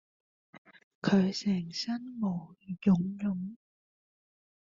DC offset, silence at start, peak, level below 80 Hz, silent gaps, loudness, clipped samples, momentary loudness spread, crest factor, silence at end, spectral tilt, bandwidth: under 0.1%; 0.55 s; -14 dBFS; -66 dBFS; 0.58-0.65 s, 0.84-1.02 s; -31 LUFS; under 0.1%; 12 LU; 18 dB; 1.1 s; -6.5 dB/octave; 7.4 kHz